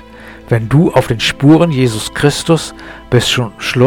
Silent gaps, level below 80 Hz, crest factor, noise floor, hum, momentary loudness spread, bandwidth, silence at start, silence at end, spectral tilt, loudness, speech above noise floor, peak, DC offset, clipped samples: none; -36 dBFS; 12 dB; -34 dBFS; none; 8 LU; 17.5 kHz; 0.1 s; 0 s; -5.5 dB/octave; -12 LUFS; 22 dB; 0 dBFS; under 0.1%; under 0.1%